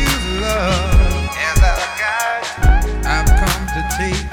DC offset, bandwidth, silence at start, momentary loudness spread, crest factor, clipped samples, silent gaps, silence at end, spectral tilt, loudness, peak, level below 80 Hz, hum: under 0.1%; 19 kHz; 0 s; 5 LU; 12 dB; under 0.1%; none; 0 s; -4 dB/octave; -17 LUFS; -2 dBFS; -16 dBFS; none